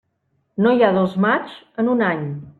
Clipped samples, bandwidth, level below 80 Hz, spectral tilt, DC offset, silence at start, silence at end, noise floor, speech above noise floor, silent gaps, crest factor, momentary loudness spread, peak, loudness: under 0.1%; 4.5 kHz; -62 dBFS; -9 dB/octave; under 0.1%; 0.6 s; 0.1 s; -68 dBFS; 50 dB; none; 16 dB; 11 LU; -2 dBFS; -18 LUFS